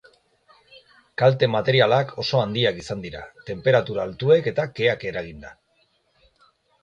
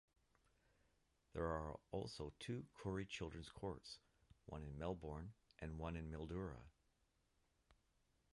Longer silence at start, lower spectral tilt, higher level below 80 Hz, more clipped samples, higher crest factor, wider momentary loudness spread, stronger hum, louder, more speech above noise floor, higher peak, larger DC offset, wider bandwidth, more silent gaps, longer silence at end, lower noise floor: second, 1.2 s vs 1.35 s; about the same, -6 dB/octave vs -6.5 dB/octave; first, -56 dBFS vs -62 dBFS; neither; about the same, 20 dB vs 22 dB; first, 17 LU vs 11 LU; neither; first, -21 LUFS vs -50 LUFS; first, 44 dB vs 33 dB; first, -4 dBFS vs -30 dBFS; neither; second, 8.8 kHz vs 11.5 kHz; neither; first, 1.3 s vs 0.6 s; second, -66 dBFS vs -83 dBFS